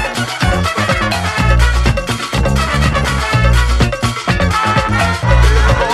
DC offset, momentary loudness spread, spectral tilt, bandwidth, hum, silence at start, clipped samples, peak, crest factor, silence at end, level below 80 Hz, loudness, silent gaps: under 0.1%; 4 LU; -5 dB/octave; 13 kHz; none; 0 s; under 0.1%; 0 dBFS; 12 dB; 0 s; -16 dBFS; -14 LUFS; none